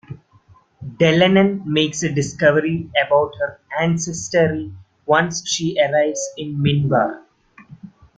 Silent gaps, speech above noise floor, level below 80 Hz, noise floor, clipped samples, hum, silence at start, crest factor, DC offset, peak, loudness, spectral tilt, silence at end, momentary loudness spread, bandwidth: none; 34 dB; -54 dBFS; -52 dBFS; under 0.1%; none; 0.1 s; 18 dB; under 0.1%; -2 dBFS; -18 LUFS; -5 dB/octave; 0.3 s; 11 LU; 9.4 kHz